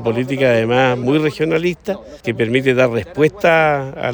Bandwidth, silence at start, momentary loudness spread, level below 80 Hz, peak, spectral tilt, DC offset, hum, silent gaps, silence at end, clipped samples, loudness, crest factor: over 20 kHz; 0 s; 9 LU; -48 dBFS; -2 dBFS; -6.5 dB/octave; under 0.1%; none; none; 0 s; under 0.1%; -16 LUFS; 14 dB